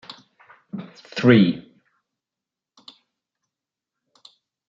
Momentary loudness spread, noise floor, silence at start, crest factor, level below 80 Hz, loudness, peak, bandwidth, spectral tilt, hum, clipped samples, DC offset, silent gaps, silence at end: 22 LU; -88 dBFS; 0.75 s; 22 dB; -68 dBFS; -18 LUFS; -2 dBFS; 7.2 kHz; -7.5 dB/octave; none; under 0.1%; under 0.1%; none; 3.1 s